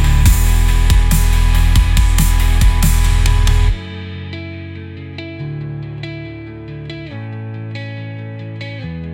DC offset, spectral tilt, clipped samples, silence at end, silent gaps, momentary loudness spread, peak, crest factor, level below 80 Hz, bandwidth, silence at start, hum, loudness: under 0.1%; -4.5 dB/octave; under 0.1%; 0 s; none; 15 LU; 0 dBFS; 14 dB; -16 dBFS; 17 kHz; 0 s; none; -17 LUFS